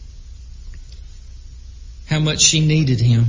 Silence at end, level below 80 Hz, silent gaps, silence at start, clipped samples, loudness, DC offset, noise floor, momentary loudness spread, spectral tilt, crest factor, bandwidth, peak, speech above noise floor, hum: 0 s; -36 dBFS; none; 0 s; under 0.1%; -15 LUFS; under 0.1%; -36 dBFS; 24 LU; -4 dB/octave; 20 dB; 7.6 kHz; 0 dBFS; 21 dB; none